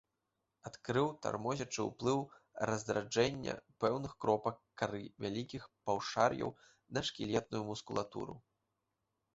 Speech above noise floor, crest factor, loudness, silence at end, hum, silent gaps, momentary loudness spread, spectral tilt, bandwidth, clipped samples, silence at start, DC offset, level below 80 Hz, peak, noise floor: 49 dB; 24 dB; -38 LUFS; 0.95 s; none; none; 11 LU; -4.5 dB/octave; 8 kHz; under 0.1%; 0.65 s; under 0.1%; -68 dBFS; -14 dBFS; -86 dBFS